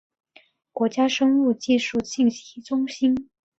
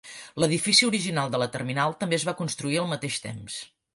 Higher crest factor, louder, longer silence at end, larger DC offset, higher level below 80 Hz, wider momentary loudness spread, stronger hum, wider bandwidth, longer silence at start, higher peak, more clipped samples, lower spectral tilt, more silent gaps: second, 14 dB vs 20 dB; first, -22 LUFS vs -25 LUFS; about the same, 0.35 s vs 0.3 s; neither; about the same, -62 dBFS vs -64 dBFS; second, 9 LU vs 16 LU; neither; second, 8 kHz vs 11.5 kHz; first, 0.75 s vs 0.05 s; about the same, -8 dBFS vs -6 dBFS; neither; about the same, -4 dB/octave vs -3.5 dB/octave; neither